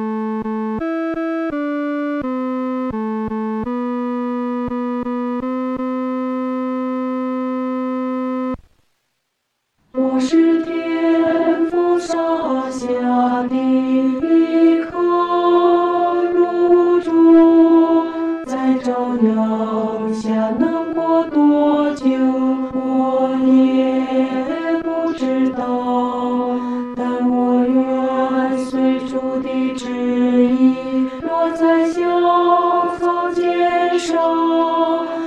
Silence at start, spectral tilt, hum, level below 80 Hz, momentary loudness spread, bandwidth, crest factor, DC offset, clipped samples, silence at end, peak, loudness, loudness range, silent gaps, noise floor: 0 s; -6 dB/octave; none; -52 dBFS; 8 LU; 9 kHz; 14 dB; under 0.1%; under 0.1%; 0 s; -4 dBFS; -17 LUFS; 8 LU; none; -72 dBFS